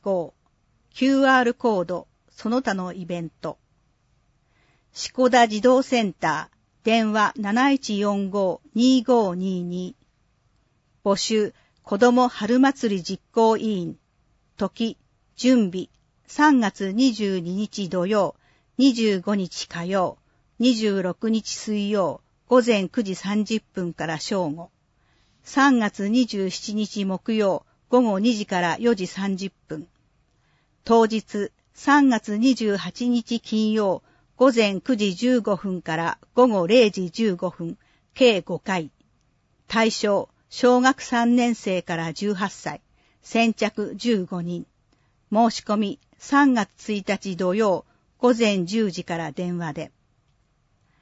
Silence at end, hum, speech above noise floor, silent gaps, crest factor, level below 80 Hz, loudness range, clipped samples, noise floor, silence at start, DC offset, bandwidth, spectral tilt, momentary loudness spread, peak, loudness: 1.15 s; none; 44 dB; none; 18 dB; -62 dBFS; 3 LU; under 0.1%; -65 dBFS; 0.05 s; under 0.1%; 8 kHz; -5 dB/octave; 13 LU; -6 dBFS; -22 LUFS